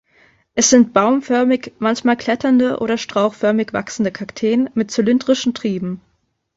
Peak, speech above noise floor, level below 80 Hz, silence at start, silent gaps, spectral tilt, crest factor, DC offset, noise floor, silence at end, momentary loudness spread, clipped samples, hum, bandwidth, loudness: 0 dBFS; 38 dB; -56 dBFS; 0.55 s; none; -4 dB/octave; 18 dB; under 0.1%; -55 dBFS; 0.6 s; 10 LU; under 0.1%; none; 8 kHz; -17 LUFS